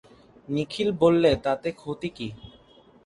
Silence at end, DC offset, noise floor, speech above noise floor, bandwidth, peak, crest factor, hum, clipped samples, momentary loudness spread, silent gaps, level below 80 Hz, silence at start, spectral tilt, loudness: 0.55 s; under 0.1%; -55 dBFS; 31 dB; 11.5 kHz; -8 dBFS; 20 dB; none; under 0.1%; 14 LU; none; -50 dBFS; 0.5 s; -6.5 dB/octave; -25 LUFS